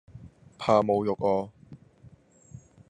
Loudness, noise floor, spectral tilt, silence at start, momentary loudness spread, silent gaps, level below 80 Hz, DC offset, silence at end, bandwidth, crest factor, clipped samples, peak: -26 LUFS; -55 dBFS; -7 dB/octave; 0.15 s; 10 LU; none; -64 dBFS; under 0.1%; 1.15 s; 9.8 kHz; 22 dB; under 0.1%; -8 dBFS